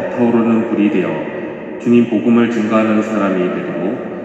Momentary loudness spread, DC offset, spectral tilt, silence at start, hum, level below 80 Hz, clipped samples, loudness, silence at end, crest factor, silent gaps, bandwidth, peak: 9 LU; under 0.1%; -7.5 dB/octave; 0 s; none; -58 dBFS; under 0.1%; -15 LUFS; 0 s; 14 dB; none; 7.8 kHz; 0 dBFS